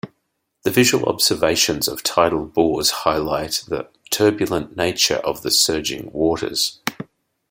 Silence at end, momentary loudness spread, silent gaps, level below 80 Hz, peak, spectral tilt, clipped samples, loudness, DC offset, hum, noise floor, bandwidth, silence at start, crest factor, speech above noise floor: 0.5 s; 11 LU; none; -50 dBFS; -2 dBFS; -3 dB/octave; under 0.1%; -19 LUFS; under 0.1%; none; -73 dBFS; 17 kHz; 0.05 s; 18 dB; 53 dB